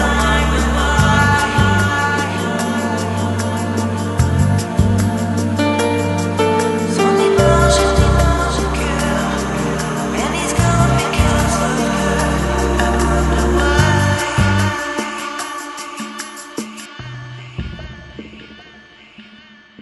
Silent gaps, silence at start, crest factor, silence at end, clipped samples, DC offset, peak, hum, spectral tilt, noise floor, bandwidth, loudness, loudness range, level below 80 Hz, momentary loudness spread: none; 0 s; 16 dB; 0 s; under 0.1%; under 0.1%; 0 dBFS; none; -5 dB/octave; -43 dBFS; 12 kHz; -16 LUFS; 13 LU; -24 dBFS; 15 LU